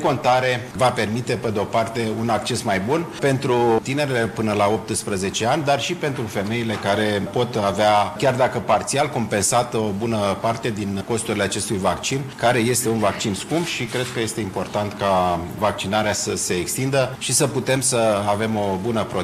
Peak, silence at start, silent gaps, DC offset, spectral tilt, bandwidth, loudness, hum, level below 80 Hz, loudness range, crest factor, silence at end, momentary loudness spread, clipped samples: -8 dBFS; 0 s; none; under 0.1%; -4 dB/octave; 14.5 kHz; -21 LUFS; none; -50 dBFS; 2 LU; 14 dB; 0 s; 6 LU; under 0.1%